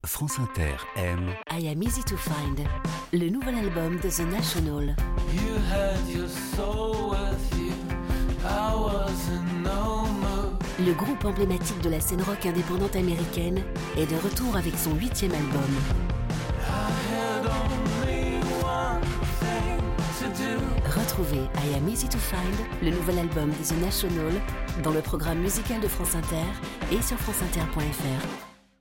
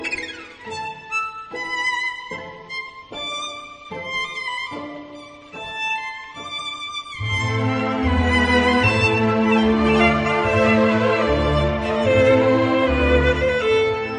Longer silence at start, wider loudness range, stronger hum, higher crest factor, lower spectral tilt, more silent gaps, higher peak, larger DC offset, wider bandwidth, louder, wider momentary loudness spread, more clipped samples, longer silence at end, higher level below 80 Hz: about the same, 0.05 s vs 0 s; second, 2 LU vs 11 LU; neither; about the same, 16 dB vs 16 dB; about the same, -5 dB/octave vs -6 dB/octave; neither; second, -12 dBFS vs -4 dBFS; neither; first, 17 kHz vs 10 kHz; second, -28 LUFS vs -19 LUFS; second, 4 LU vs 16 LU; neither; first, 0.3 s vs 0 s; about the same, -32 dBFS vs -34 dBFS